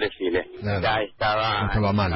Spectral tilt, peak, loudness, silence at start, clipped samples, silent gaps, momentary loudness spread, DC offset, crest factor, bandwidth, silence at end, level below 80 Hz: -10.5 dB/octave; -10 dBFS; -24 LUFS; 0 s; under 0.1%; none; 4 LU; under 0.1%; 14 dB; 5.8 kHz; 0 s; -38 dBFS